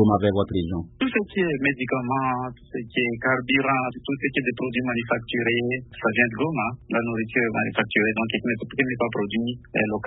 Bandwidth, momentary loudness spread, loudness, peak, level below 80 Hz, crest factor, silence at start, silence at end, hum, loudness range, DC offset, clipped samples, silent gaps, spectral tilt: 4 kHz; 6 LU; -24 LUFS; -4 dBFS; -52 dBFS; 20 dB; 0 s; 0 s; none; 1 LU; under 0.1%; under 0.1%; none; -10.5 dB/octave